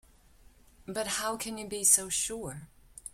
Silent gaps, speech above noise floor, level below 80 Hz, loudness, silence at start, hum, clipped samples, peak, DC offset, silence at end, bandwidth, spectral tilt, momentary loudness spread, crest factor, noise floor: none; 28 dB; -60 dBFS; -28 LUFS; 0.85 s; none; under 0.1%; -8 dBFS; under 0.1%; 0.05 s; 16.5 kHz; -1 dB/octave; 19 LU; 26 dB; -59 dBFS